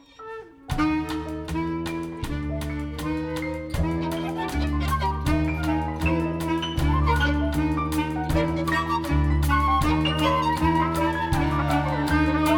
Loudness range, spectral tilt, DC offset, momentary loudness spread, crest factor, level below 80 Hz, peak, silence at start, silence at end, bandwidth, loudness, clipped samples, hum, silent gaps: 6 LU; -6.5 dB/octave; under 0.1%; 9 LU; 14 dB; -30 dBFS; -8 dBFS; 0.2 s; 0 s; 18.5 kHz; -25 LUFS; under 0.1%; none; none